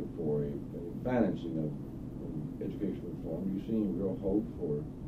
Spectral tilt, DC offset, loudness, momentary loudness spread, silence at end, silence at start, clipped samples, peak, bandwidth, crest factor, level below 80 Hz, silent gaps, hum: -10 dB/octave; under 0.1%; -35 LUFS; 9 LU; 0 s; 0 s; under 0.1%; -14 dBFS; 14.5 kHz; 20 dB; -52 dBFS; none; none